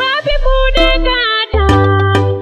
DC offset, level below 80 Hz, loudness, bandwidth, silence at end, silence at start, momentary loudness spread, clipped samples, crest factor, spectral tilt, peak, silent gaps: under 0.1%; -16 dBFS; -12 LUFS; 9 kHz; 0 s; 0 s; 3 LU; under 0.1%; 12 dB; -6 dB/octave; 0 dBFS; none